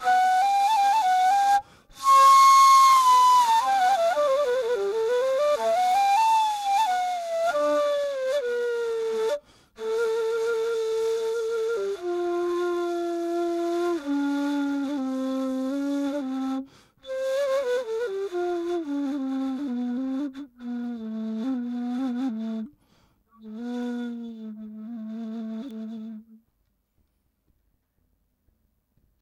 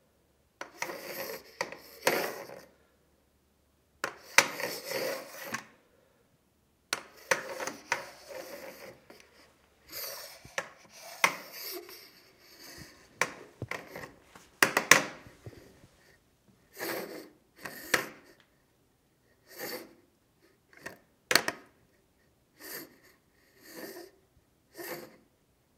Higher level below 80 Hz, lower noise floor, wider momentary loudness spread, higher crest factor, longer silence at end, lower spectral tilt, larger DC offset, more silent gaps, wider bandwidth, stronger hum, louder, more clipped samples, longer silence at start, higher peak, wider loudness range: first, -68 dBFS vs -74 dBFS; about the same, -71 dBFS vs -70 dBFS; second, 17 LU vs 24 LU; second, 16 dB vs 38 dB; first, 2.85 s vs 0.7 s; first, -3 dB/octave vs -1 dB/octave; neither; neither; about the same, 16 kHz vs 16 kHz; neither; first, -23 LUFS vs -32 LUFS; neither; second, 0 s vs 0.6 s; second, -8 dBFS vs 0 dBFS; first, 18 LU vs 11 LU